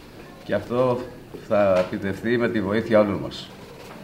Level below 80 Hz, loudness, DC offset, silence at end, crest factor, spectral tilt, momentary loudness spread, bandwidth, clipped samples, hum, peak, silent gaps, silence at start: -52 dBFS; -23 LUFS; under 0.1%; 0 s; 18 dB; -7 dB/octave; 21 LU; 16 kHz; under 0.1%; none; -6 dBFS; none; 0 s